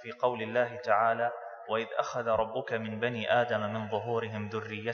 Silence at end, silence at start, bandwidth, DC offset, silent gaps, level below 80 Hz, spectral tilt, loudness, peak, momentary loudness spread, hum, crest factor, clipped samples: 0 s; 0 s; 6.8 kHz; under 0.1%; none; -68 dBFS; -6 dB/octave; -31 LUFS; -12 dBFS; 8 LU; none; 20 dB; under 0.1%